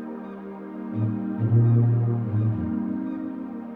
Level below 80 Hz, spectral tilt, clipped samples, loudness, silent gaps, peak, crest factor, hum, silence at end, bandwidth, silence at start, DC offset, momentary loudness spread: -62 dBFS; -12.5 dB/octave; under 0.1%; -24 LUFS; none; -10 dBFS; 14 dB; none; 0 s; 2.6 kHz; 0 s; under 0.1%; 17 LU